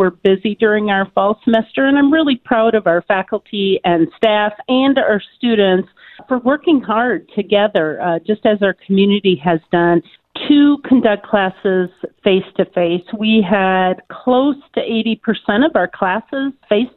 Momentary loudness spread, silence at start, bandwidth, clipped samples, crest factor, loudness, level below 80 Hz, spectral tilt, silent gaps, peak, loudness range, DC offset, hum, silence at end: 6 LU; 0 s; 4.3 kHz; under 0.1%; 14 dB; -15 LUFS; -54 dBFS; -9 dB/octave; none; 0 dBFS; 2 LU; under 0.1%; none; 0.1 s